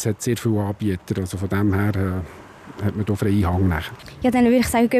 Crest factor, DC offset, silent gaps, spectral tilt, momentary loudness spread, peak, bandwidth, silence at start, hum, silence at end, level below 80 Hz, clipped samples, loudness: 14 dB; under 0.1%; none; -6.5 dB/octave; 12 LU; -6 dBFS; 15 kHz; 0 s; none; 0 s; -44 dBFS; under 0.1%; -21 LUFS